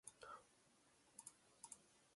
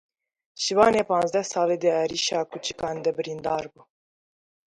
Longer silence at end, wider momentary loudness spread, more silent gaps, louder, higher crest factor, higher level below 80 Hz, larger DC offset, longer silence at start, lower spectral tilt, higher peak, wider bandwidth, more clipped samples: second, 0 s vs 1 s; second, 4 LU vs 11 LU; neither; second, -61 LUFS vs -24 LUFS; first, 26 dB vs 20 dB; second, under -90 dBFS vs -62 dBFS; neither; second, 0.05 s vs 0.6 s; second, -1 dB/octave vs -3.5 dB/octave; second, -38 dBFS vs -6 dBFS; about the same, 11.5 kHz vs 11.5 kHz; neither